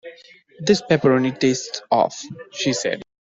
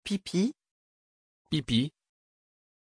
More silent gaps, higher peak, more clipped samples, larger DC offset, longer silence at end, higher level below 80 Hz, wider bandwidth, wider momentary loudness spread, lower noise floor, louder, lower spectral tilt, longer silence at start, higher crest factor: second, none vs 0.71-1.45 s; first, -4 dBFS vs -12 dBFS; neither; neither; second, 0.3 s vs 0.9 s; about the same, -60 dBFS vs -60 dBFS; second, 7.8 kHz vs 10.5 kHz; first, 15 LU vs 6 LU; second, -48 dBFS vs under -90 dBFS; first, -20 LUFS vs -30 LUFS; about the same, -4.5 dB/octave vs -5.5 dB/octave; about the same, 0.05 s vs 0.05 s; about the same, 18 dB vs 20 dB